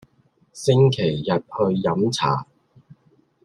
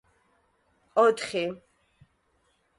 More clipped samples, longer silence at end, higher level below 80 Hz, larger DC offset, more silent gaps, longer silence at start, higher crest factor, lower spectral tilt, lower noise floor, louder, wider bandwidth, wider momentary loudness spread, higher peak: neither; second, 1 s vs 1.25 s; first, -58 dBFS vs -72 dBFS; neither; neither; second, 0.55 s vs 0.95 s; about the same, 18 dB vs 20 dB; first, -6.5 dB/octave vs -4 dB/octave; second, -61 dBFS vs -70 dBFS; first, -21 LUFS vs -26 LUFS; about the same, 11.5 kHz vs 11.5 kHz; second, 8 LU vs 13 LU; first, -4 dBFS vs -10 dBFS